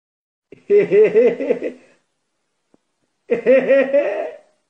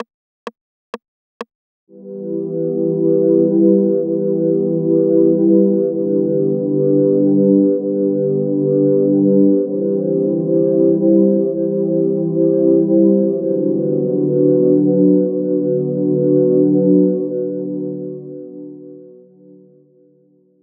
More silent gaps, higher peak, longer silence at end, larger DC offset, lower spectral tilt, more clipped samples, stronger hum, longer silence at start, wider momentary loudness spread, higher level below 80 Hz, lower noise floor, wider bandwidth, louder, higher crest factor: second, none vs 0.14-0.47 s, 0.61-0.93 s, 1.08-1.40 s, 1.55-1.87 s; about the same, -4 dBFS vs -2 dBFS; second, 0.35 s vs 1.55 s; neither; second, -7.5 dB/octave vs -12.5 dB/octave; neither; neither; first, 0.7 s vs 0 s; second, 13 LU vs 19 LU; about the same, -68 dBFS vs -70 dBFS; first, -73 dBFS vs -54 dBFS; first, 6 kHz vs 3.4 kHz; about the same, -16 LUFS vs -15 LUFS; about the same, 14 dB vs 14 dB